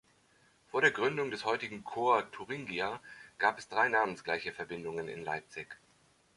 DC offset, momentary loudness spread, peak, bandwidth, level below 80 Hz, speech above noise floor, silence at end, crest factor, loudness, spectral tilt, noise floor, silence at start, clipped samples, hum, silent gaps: under 0.1%; 15 LU; -12 dBFS; 11.5 kHz; -72 dBFS; 34 dB; 0.6 s; 22 dB; -33 LUFS; -4 dB/octave; -68 dBFS; 0.75 s; under 0.1%; none; none